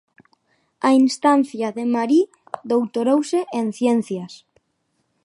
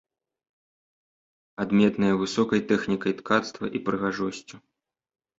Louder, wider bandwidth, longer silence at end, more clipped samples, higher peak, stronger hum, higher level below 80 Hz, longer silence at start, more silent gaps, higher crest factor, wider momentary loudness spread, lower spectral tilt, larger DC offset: first, -20 LUFS vs -25 LUFS; first, 11.5 kHz vs 8 kHz; about the same, 0.9 s vs 0.8 s; neither; about the same, -6 dBFS vs -6 dBFS; neither; second, -74 dBFS vs -62 dBFS; second, 0.85 s vs 1.6 s; neither; second, 16 dB vs 22 dB; about the same, 11 LU vs 10 LU; about the same, -5 dB/octave vs -6 dB/octave; neither